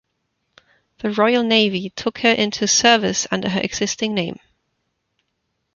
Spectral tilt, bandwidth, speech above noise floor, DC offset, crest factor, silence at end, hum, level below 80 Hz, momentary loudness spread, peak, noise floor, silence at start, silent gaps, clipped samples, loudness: -3 dB/octave; 7.4 kHz; 55 dB; under 0.1%; 20 dB; 1.4 s; none; -56 dBFS; 10 LU; 0 dBFS; -73 dBFS; 1.05 s; none; under 0.1%; -18 LUFS